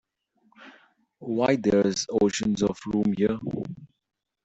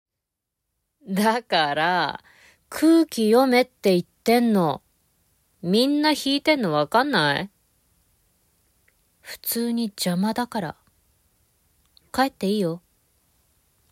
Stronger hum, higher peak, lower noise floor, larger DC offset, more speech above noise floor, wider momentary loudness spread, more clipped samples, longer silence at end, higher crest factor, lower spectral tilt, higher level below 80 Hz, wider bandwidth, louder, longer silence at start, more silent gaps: neither; second, -10 dBFS vs -6 dBFS; second, -67 dBFS vs -84 dBFS; neither; second, 42 dB vs 62 dB; about the same, 13 LU vs 12 LU; neither; second, 0.6 s vs 1.15 s; about the same, 18 dB vs 18 dB; about the same, -5.5 dB/octave vs -5 dB/octave; first, -56 dBFS vs -64 dBFS; second, 8.2 kHz vs 16 kHz; second, -25 LUFS vs -22 LUFS; second, 0.6 s vs 1.05 s; neither